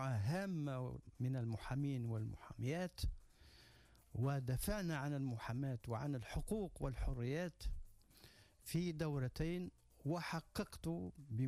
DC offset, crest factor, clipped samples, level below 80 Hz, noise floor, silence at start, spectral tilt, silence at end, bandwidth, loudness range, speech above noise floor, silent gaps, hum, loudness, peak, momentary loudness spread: under 0.1%; 14 dB; under 0.1%; -54 dBFS; -67 dBFS; 0 s; -6.5 dB/octave; 0 s; 15.5 kHz; 2 LU; 25 dB; none; none; -44 LUFS; -30 dBFS; 11 LU